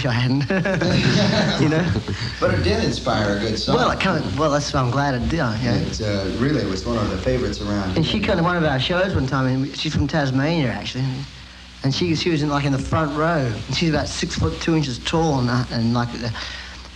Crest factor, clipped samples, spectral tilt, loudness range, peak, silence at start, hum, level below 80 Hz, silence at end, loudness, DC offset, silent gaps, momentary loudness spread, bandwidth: 16 dB; under 0.1%; -5.5 dB/octave; 2 LU; -4 dBFS; 0 s; none; -36 dBFS; 0 s; -21 LUFS; under 0.1%; none; 6 LU; 10.5 kHz